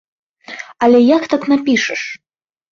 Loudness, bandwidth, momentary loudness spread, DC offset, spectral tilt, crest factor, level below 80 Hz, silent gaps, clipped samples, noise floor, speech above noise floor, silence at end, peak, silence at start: -14 LUFS; 7.4 kHz; 20 LU; under 0.1%; -4 dB/octave; 14 dB; -60 dBFS; none; under 0.1%; -34 dBFS; 21 dB; 0.55 s; -2 dBFS; 0.5 s